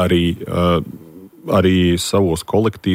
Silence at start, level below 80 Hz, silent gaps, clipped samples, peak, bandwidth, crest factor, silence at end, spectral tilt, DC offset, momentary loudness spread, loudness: 0 s; -38 dBFS; none; under 0.1%; -4 dBFS; 16 kHz; 14 dB; 0 s; -6 dB/octave; under 0.1%; 13 LU; -17 LUFS